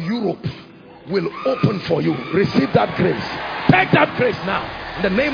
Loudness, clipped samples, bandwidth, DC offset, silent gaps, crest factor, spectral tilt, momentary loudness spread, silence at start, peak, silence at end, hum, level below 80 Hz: -19 LUFS; under 0.1%; 5.2 kHz; under 0.1%; none; 18 dB; -7.5 dB/octave; 9 LU; 0 s; 0 dBFS; 0 s; none; -46 dBFS